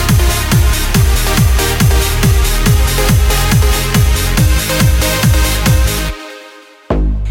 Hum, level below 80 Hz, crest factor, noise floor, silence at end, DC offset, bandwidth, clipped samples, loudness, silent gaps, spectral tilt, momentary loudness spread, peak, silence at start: none; -14 dBFS; 10 dB; -37 dBFS; 0 s; under 0.1%; 17 kHz; under 0.1%; -12 LUFS; none; -4.5 dB/octave; 5 LU; 0 dBFS; 0 s